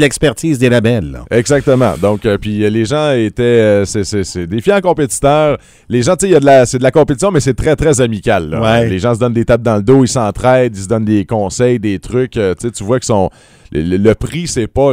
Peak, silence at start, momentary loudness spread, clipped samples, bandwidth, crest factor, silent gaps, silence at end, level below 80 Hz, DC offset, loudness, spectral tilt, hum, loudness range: 0 dBFS; 0 s; 7 LU; 0.2%; 16 kHz; 12 dB; none; 0 s; -32 dBFS; under 0.1%; -12 LUFS; -5.5 dB/octave; none; 4 LU